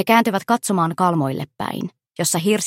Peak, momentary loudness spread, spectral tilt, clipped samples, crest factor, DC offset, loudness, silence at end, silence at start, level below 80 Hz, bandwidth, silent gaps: -2 dBFS; 11 LU; -4.5 dB/octave; under 0.1%; 18 dB; under 0.1%; -20 LUFS; 0 s; 0 s; -64 dBFS; 16.5 kHz; none